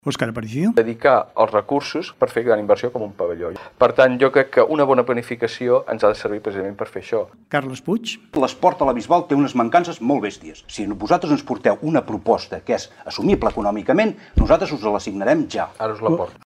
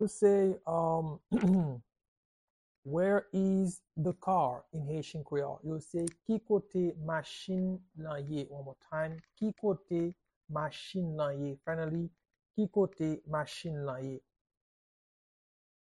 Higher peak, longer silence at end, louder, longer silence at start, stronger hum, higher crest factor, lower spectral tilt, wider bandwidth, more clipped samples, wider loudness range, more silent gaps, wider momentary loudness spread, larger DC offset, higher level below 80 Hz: first, -2 dBFS vs -16 dBFS; second, 0.15 s vs 1.75 s; first, -20 LUFS vs -34 LUFS; about the same, 0.05 s vs 0 s; neither; about the same, 18 dB vs 18 dB; about the same, -6 dB/octave vs -7 dB/octave; first, 13 kHz vs 11.5 kHz; neither; about the same, 4 LU vs 5 LU; second, none vs 2.08-2.83 s, 10.36-10.41 s; about the same, 9 LU vs 11 LU; neither; first, -36 dBFS vs -66 dBFS